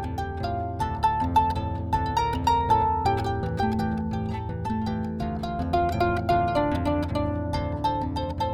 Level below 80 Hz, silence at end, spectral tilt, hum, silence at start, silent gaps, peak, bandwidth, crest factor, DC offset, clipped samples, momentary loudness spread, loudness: -38 dBFS; 0 s; -7.5 dB/octave; none; 0 s; none; -10 dBFS; 14 kHz; 16 dB; under 0.1%; under 0.1%; 7 LU; -26 LUFS